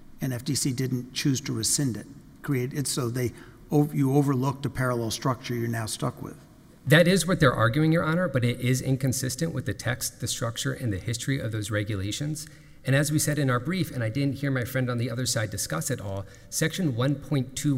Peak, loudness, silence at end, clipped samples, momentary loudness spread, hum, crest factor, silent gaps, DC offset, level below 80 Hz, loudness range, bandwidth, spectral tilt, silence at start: -6 dBFS; -26 LUFS; 0 s; under 0.1%; 9 LU; none; 20 dB; none; under 0.1%; -52 dBFS; 5 LU; 16 kHz; -5 dB/octave; 0 s